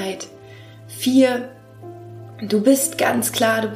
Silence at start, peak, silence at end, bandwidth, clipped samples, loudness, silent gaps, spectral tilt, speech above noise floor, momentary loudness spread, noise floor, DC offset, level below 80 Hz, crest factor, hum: 0 s; -4 dBFS; 0 s; 15.5 kHz; under 0.1%; -18 LUFS; none; -3.5 dB/octave; 23 dB; 22 LU; -41 dBFS; under 0.1%; -64 dBFS; 18 dB; none